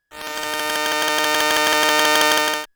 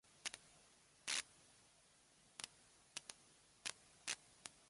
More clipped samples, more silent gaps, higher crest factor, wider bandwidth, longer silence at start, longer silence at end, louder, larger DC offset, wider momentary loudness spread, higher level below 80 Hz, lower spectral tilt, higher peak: neither; neither; second, 20 dB vs 34 dB; first, over 20 kHz vs 11.5 kHz; about the same, 0.15 s vs 0.15 s; about the same, 0.1 s vs 0.05 s; first, -17 LUFS vs -49 LUFS; neither; second, 10 LU vs 24 LU; first, -58 dBFS vs -84 dBFS; about the same, 0 dB/octave vs 1 dB/octave; first, 0 dBFS vs -22 dBFS